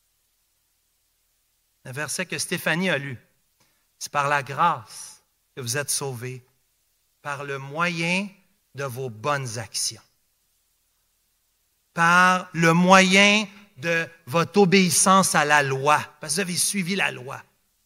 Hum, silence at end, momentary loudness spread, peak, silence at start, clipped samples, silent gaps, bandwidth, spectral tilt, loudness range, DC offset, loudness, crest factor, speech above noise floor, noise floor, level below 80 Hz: none; 0.45 s; 20 LU; 0 dBFS; 1.85 s; under 0.1%; none; 16 kHz; -3.5 dB/octave; 12 LU; under 0.1%; -21 LUFS; 24 dB; 48 dB; -69 dBFS; -68 dBFS